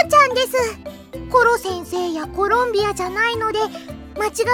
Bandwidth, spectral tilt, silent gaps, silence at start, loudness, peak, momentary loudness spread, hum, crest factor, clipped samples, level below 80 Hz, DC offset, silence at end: 17.5 kHz; -3.5 dB/octave; none; 0 s; -19 LUFS; -2 dBFS; 17 LU; none; 16 dB; under 0.1%; -44 dBFS; under 0.1%; 0 s